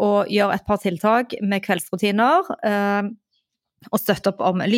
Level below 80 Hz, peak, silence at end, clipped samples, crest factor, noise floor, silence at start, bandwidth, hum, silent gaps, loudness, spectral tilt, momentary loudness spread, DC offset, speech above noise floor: -54 dBFS; -4 dBFS; 0 s; under 0.1%; 16 dB; -73 dBFS; 0 s; 17 kHz; none; none; -21 LUFS; -5.5 dB/octave; 6 LU; under 0.1%; 53 dB